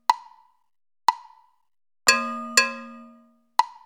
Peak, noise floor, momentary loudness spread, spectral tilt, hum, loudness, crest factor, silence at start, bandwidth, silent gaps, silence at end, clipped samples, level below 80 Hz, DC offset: 0 dBFS; -56 dBFS; 18 LU; 1 dB/octave; none; -23 LUFS; 26 dB; 0.1 s; over 20 kHz; none; 0.15 s; under 0.1%; -70 dBFS; under 0.1%